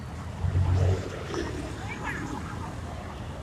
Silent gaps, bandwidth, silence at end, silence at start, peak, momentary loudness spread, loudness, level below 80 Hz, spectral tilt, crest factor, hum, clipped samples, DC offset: none; 11.5 kHz; 0 s; 0 s; -12 dBFS; 12 LU; -31 LUFS; -42 dBFS; -6.5 dB/octave; 18 dB; none; under 0.1%; under 0.1%